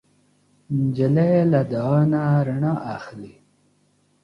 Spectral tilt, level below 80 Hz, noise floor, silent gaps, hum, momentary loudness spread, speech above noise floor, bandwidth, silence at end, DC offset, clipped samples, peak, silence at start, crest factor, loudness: -10 dB/octave; -60 dBFS; -63 dBFS; none; 50 Hz at -40 dBFS; 15 LU; 43 dB; 6 kHz; 0.95 s; under 0.1%; under 0.1%; -6 dBFS; 0.7 s; 16 dB; -20 LUFS